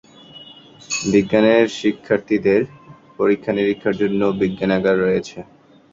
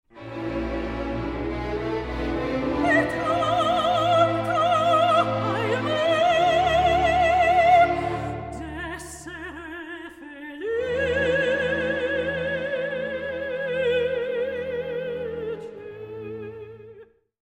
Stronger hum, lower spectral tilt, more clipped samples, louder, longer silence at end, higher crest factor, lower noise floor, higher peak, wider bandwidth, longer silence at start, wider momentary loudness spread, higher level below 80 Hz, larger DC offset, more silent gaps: neither; about the same, -5.5 dB/octave vs -5.5 dB/octave; neither; first, -18 LUFS vs -23 LUFS; about the same, 0.5 s vs 0.4 s; about the same, 18 dB vs 16 dB; second, -42 dBFS vs -49 dBFS; first, -2 dBFS vs -8 dBFS; second, 7.8 kHz vs 12.5 kHz; first, 0.35 s vs 0.15 s; second, 12 LU vs 17 LU; second, -52 dBFS vs -42 dBFS; neither; neither